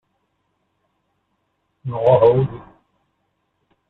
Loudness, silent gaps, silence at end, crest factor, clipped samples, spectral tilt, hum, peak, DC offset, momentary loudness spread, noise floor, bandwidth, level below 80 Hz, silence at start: -17 LUFS; none; 1.3 s; 20 dB; under 0.1%; -10.5 dB/octave; none; -2 dBFS; under 0.1%; 21 LU; -70 dBFS; 4.2 kHz; -56 dBFS; 1.85 s